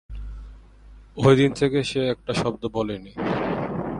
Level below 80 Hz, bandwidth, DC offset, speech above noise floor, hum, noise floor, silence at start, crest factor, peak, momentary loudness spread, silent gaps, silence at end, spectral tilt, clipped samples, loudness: -42 dBFS; 11 kHz; under 0.1%; 25 dB; none; -47 dBFS; 0.1 s; 22 dB; -2 dBFS; 21 LU; none; 0 s; -6.5 dB/octave; under 0.1%; -23 LUFS